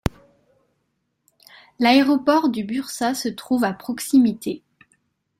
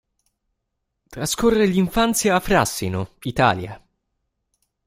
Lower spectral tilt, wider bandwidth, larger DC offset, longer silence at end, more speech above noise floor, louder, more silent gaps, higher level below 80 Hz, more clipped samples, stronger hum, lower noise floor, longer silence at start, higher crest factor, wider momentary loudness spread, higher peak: about the same, -4.5 dB/octave vs -4.5 dB/octave; about the same, 16 kHz vs 16 kHz; neither; second, 0.8 s vs 1.1 s; second, 53 dB vs 58 dB; about the same, -20 LUFS vs -20 LUFS; neither; second, -48 dBFS vs -42 dBFS; neither; neither; second, -73 dBFS vs -77 dBFS; second, 0.05 s vs 1.1 s; about the same, 20 dB vs 20 dB; about the same, 13 LU vs 11 LU; about the same, -2 dBFS vs -2 dBFS